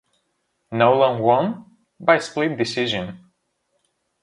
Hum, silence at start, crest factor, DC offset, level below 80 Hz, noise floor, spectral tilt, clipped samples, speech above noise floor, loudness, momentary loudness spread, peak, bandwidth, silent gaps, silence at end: none; 0.7 s; 22 dB; under 0.1%; -62 dBFS; -72 dBFS; -5.5 dB/octave; under 0.1%; 53 dB; -20 LUFS; 13 LU; 0 dBFS; 11.5 kHz; none; 1.05 s